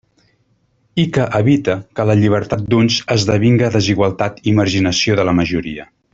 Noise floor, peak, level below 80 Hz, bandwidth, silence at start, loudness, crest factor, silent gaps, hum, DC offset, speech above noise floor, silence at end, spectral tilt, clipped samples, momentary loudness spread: -60 dBFS; -2 dBFS; -44 dBFS; 7.8 kHz; 0.95 s; -15 LUFS; 14 dB; none; none; under 0.1%; 46 dB; 0.3 s; -6 dB/octave; under 0.1%; 6 LU